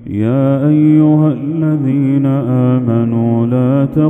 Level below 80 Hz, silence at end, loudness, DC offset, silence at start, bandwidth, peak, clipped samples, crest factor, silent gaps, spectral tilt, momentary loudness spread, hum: -48 dBFS; 0 s; -12 LUFS; under 0.1%; 0 s; 3.7 kHz; 0 dBFS; under 0.1%; 12 dB; none; -11.5 dB/octave; 5 LU; none